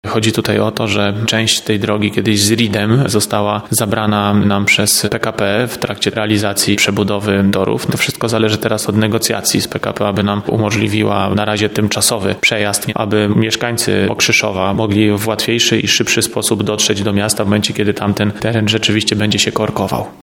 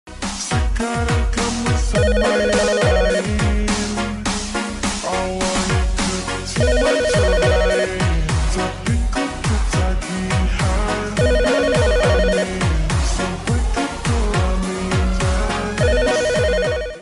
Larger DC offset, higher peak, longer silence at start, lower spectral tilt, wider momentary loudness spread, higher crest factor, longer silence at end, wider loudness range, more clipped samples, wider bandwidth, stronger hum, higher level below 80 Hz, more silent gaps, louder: neither; first, 0 dBFS vs -6 dBFS; about the same, 0.05 s vs 0.05 s; about the same, -4 dB/octave vs -5 dB/octave; about the same, 4 LU vs 6 LU; about the same, 14 dB vs 12 dB; about the same, 0.1 s vs 0 s; about the same, 2 LU vs 2 LU; neither; first, 17.5 kHz vs 11.5 kHz; neither; second, -46 dBFS vs -22 dBFS; neither; first, -14 LUFS vs -19 LUFS